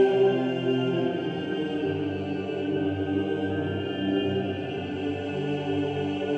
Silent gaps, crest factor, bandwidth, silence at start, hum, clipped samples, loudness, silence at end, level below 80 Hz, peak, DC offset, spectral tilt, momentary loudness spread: none; 16 dB; 8 kHz; 0 s; none; under 0.1%; -28 LUFS; 0 s; -64 dBFS; -10 dBFS; under 0.1%; -8 dB/octave; 5 LU